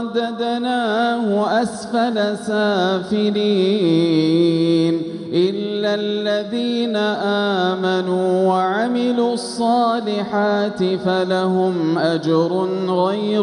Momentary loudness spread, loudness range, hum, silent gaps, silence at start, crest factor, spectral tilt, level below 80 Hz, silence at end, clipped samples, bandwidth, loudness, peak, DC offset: 5 LU; 2 LU; none; none; 0 s; 12 dB; -6 dB/octave; -64 dBFS; 0 s; under 0.1%; 11 kHz; -18 LUFS; -6 dBFS; under 0.1%